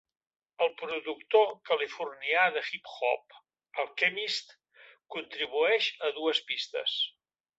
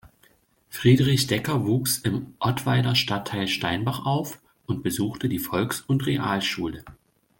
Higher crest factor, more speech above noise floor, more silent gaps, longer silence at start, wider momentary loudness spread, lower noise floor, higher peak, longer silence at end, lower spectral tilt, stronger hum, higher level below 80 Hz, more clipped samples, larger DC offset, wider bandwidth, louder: about the same, 20 dB vs 20 dB; second, 28 dB vs 37 dB; neither; first, 0.6 s vs 0.05 s; about the same, 10 LU vs 10 LU; about the same, -58 dBFS vs -61 dBFS; second, -12 dBFS vs -6 dBFS; about the same, 0.5 s vs 0.5 s; second, -1.5 dB/octave vs -5 dB/octave; neither; second, -84 dBFS vs -54 dBFS; neither; neither; second, 8 kHz vs 17 kHz; second, -30 LUFS vs -24 LUFS